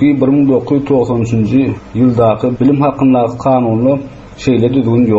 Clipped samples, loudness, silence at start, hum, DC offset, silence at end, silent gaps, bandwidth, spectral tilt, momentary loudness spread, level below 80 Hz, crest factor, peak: under 0.1%; -12 LUFS; 0 s; none; under 0.1%; 0 s; none; 7.6 kHz; -8.5 dB/octave; 4 LU; -40 dBFS; 10 dB; -2 dBFS